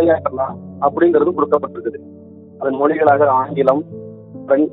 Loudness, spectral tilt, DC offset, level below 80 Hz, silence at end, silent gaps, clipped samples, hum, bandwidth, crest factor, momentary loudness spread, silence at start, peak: -16 LUFS; -10 dB/octave; under 0.1%; -60 dBFS; 0 s; none; under 0.1%; none; 4.1 kHz; 16 dB; 18 LU; 0 s; 0 dBFS